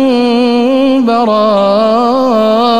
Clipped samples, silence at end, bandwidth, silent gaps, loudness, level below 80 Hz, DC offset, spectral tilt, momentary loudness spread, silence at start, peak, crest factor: under 0.1%; 0 s; 10 kHz; none; -9 LUFS; -48 dBFS; 1%; -6 dB/octave; 1 LU; 0 s; -2 dBFS; 8 dB